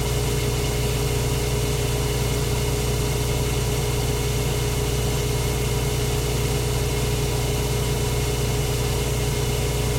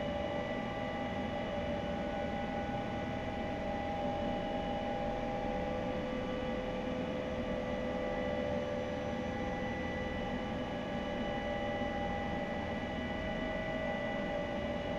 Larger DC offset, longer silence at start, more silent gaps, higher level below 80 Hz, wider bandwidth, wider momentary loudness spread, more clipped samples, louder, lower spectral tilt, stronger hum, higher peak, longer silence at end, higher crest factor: neither; about the same, 0 s vs 0 s; neither; first, -28 dBFS vs -50 dBFS; first, 17 kHz vs 12 kHz; about the same, 0 LU vs 2 LU; neither; first, -23 LUFS vs -37 LUFS; second, -4.5 dB/octave vs -6.5 dB/octave; neither; first, -10 dBFS vs -24 dBFS; about the same, 0 s vs 0 s; about the same, 12 dB vs 12 dB